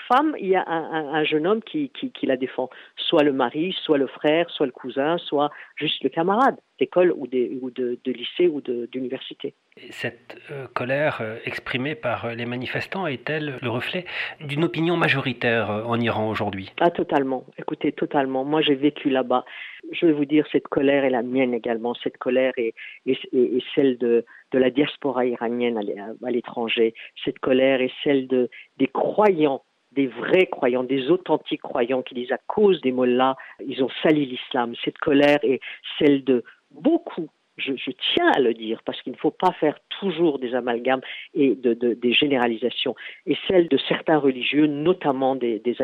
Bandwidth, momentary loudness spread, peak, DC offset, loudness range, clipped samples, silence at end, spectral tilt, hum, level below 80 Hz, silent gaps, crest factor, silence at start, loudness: 8 kHz; 10 LU; -6 dBFS; under 0.1%; 5 LU; under 0.1%; 0 s; -7 dB/octave; none; -66 dBFS; none; 16 dB; 0 s; -23 LUFS